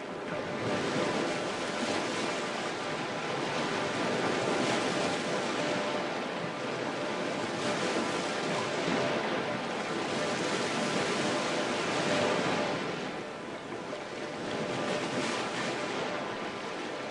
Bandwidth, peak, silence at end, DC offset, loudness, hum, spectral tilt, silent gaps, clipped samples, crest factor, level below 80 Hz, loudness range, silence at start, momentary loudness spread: 11.5 kHz; -16 dBFS; 0 s; under 0.1%; -32 LUFS; none; -4 dB/octave; none; under 0.1%; 16 dB; -70 dBFS; 4 LU; 0 s; 7 LU